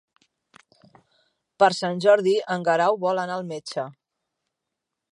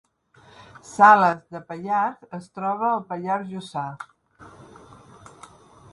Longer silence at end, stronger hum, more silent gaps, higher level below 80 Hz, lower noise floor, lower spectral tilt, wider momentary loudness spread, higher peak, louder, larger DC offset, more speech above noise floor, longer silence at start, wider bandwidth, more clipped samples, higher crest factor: second, 1.2 s vs 1.45 s; neither; neither; second, -78 dBFS vs -66 dBFS; first, -83 dBFS vs -55 dBFS; about the same, -5 dB/octave vs -5.5 dB/octave; second, 13 LU vs 23 LU; about the same, -4 dBFS vs -2 dBFS; about the same, -22 LUFS vs -21 LUFS; neither; first, 62 dB vs 33 dB; first, 1.6 s vs 0.85 s; about the same, 11 kHz vs 11.5 kHz; neither; about the same, 20 dB vs 22 dB